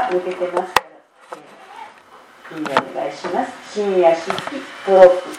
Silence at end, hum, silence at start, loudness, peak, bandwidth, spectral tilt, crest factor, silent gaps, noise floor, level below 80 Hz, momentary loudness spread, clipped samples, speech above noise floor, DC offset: 0 s; none; 0 s; -18 LUFS; 0 dBFS; 16.5 kHz; -4.5 dB/octave; 18 dB; none; -45 dBFS; -60 dBFS; 27 LU; under 0.1%; 28 dB; under 0.1%